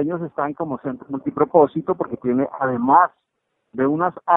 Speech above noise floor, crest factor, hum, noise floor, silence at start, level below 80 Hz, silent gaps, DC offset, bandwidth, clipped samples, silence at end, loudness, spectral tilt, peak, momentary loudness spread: 50 dB; 20 dB; none; -69 dBFS; 0 s; -62 dBFS; none; under 0.1%; 3.9 kHz; under 0.1%; 0 s; -20 LUFS; -12 dB/octave; 0 dBFS; 12 LU